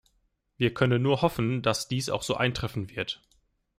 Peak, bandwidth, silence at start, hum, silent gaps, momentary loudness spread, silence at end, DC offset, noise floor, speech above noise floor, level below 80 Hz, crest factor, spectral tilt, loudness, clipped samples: -8 dBFS; 15.5 kHz; 0.6 s; none; none; 9 LU; 0.65 s; under 0.1%; -72 dBFS; 45 dB; -54 dBFS; 20 dB; -5.5 dB/octave; -28 LUFS; under 0.1%